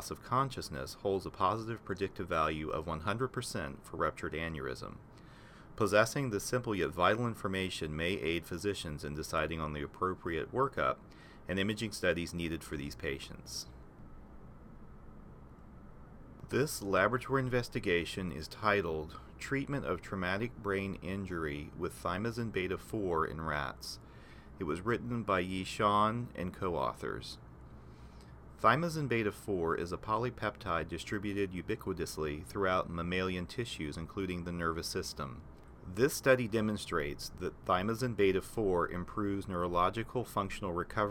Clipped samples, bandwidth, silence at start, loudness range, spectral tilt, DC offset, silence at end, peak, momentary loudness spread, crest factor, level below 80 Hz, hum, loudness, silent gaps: under 0.1%; 17.5 kHz; 0 s; 5 LU; -5 dB/octave; under 0.1%; 0 s; -12 dBFS; 23 LU; 24 dB; -54 dBFS; none; -35 LUFS; none